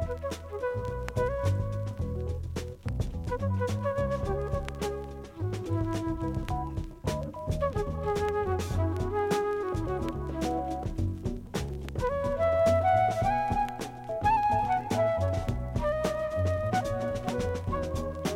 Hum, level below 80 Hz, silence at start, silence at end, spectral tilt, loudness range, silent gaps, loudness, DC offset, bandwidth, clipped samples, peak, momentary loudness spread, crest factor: none; -40 dBFS; 0 s; 0 s; -6.5 dB/octave; 6 LU; none; -30 LUFS; under 0.1%; 16 kHz; under 0.1%; -14 dBFS; 9 LU; 16 dB